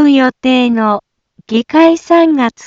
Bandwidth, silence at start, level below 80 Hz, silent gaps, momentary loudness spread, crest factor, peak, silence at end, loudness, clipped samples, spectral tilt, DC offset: 7.6 kHz; 0 s; -54 dBFS; none; 8 LU; 10 dB; 0 dBFS; 0 s; -11 LUFS; under 0.1%; -5 dB/octave; under 0.1%